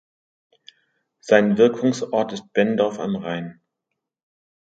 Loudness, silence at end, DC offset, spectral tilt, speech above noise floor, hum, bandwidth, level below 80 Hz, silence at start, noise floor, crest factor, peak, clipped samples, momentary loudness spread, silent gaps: -20 LUFS; 1.1 s; under 0.1%; -6 dB/octave; 62 dB; none; 8 kHz; -68 dBFS; 1.25 s; -81 dBFS; 22 dB; 0 dBFS; under 0.1%; 13 LU; none